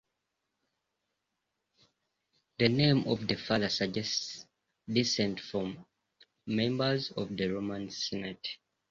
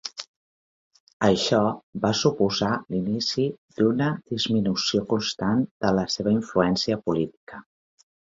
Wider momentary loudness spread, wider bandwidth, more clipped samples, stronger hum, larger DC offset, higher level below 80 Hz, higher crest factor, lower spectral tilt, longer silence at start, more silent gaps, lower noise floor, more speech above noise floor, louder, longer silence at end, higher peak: first, 15 LU vs 6 LU; about the same, 7.6 kHz vs 7.8 kHz; neither; neither; neither; second, -64 dBFS vs -56 dBFS; about the same, 22 dB vs 20 dB; about the same, -5 dB/octave vs -5 dB/octave; first, 2.6 s vs 0.05 s; second, none vs 0.28-0.91 s, 1.00-1.07 s, 1.13-1.20 s, 1.83-1.93 s, 3.58-3.68 s, 5.71-5.80 s, 7.37-7.47 s; second, -84 dBFS vs under -90 dBFS; second, 53 dB vs over 66 dB; second, -32 LUFS vs -24 LUFS; second, 0.35 s vs 0.75 s; second, -10 dBFS vs -6 dBFS